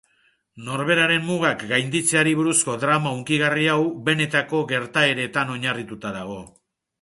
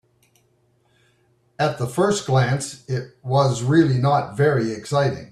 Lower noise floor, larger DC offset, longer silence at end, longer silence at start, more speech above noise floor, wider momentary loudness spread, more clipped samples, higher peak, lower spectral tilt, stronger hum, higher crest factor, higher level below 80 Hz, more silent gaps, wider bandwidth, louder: about the same, -64 dBFS vs -63 dBFS; neither; first, 0.55 s vs 0.05 s; second, 0.55 s vs 1.6 s; about the same, 42 dB vs 43 dB; first, 12 LU vs 9 LU; neither; about the same, -4 dBFS vs -4 dBFS; second, -3.5 dB/octave vs -6 dB/octave; neither; about the same, 18 dB vs 16 dB; second, -62 dBFS vs -56 dBFS; neither; about the same, 12 kHz vs 12.5 kHz; about the same, -21 LUFS vs -21 LUFS